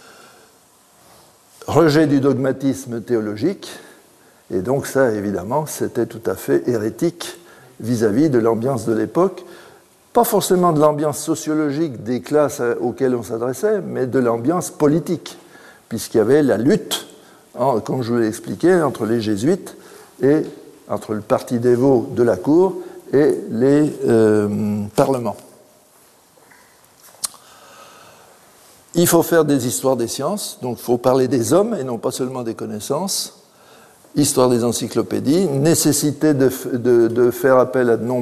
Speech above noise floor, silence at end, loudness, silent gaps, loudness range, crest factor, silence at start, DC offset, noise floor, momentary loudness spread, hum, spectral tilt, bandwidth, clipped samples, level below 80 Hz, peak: 35 dB; 0 s; -18 LUFS; none; 5 LU; 18 dB; 1.6 s; under 0.1%; -52 dBFS; 11 LU; none; -5.5 dB/octave; 13.5 kHz; under 0.1%; -58 dBFS; 0 dBFS